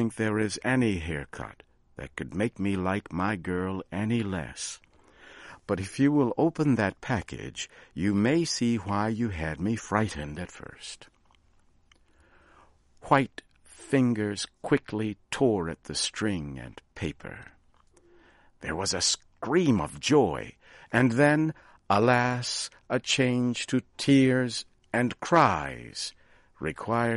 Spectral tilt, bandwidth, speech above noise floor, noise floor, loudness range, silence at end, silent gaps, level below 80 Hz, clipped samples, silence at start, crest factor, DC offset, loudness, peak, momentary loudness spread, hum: -5 dB/octave; 11.5 kHz; 35 dB; -62 dBFS; 8 LU; 0 s; none; -54 dBFS; under 0.1%; 0 s; 22 dB; under 0.1%; -27 LUFS; -6 dBFS; 17 LU; none